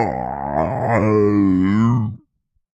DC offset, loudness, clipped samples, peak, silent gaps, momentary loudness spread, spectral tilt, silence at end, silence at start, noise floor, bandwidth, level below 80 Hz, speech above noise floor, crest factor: under 0.1%; -18 LUFS; under 0.1%; -4 dBFS; none; 8 LU; -9.5 dB/octave; 0.6 s; 0 s; -67 dBFS; 8 kHz; -44 dBFS; 51 dB; 14 dB